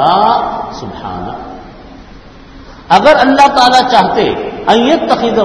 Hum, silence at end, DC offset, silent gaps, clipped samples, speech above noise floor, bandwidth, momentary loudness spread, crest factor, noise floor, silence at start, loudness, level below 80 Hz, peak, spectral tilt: none; 0 s; under 0.1%; none; 1%; 25 dB; 12 kHz; 17 LU; 10 dB; -34 dBFS; 0 s; -9 LUFS; -38 dBFS; 0 dBFS; -4.5 dB/octave